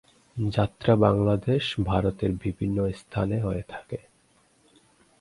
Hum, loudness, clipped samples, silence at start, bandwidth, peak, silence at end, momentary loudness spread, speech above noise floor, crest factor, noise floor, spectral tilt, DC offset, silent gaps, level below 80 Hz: none; -26 LUFS; under 0.1%; 0.35 s; 11.5 kHz; -4 dBFS; 1.2 s; 16 LU; 38 dB; 22 dB; -63 dBFS; -8 dB/octave; under 0.1%; none; -44 dBFS